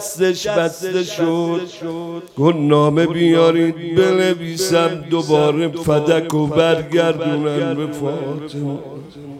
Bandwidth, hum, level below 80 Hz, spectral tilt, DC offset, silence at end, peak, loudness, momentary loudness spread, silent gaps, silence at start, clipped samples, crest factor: 16 kHz; none; -54 dBFS; -5.5 dB/octave; under 0.1%; 0 s; 0 dBFS; -17 LUFS; 12 LU; none; 0 s; under 0.1%; 16 dB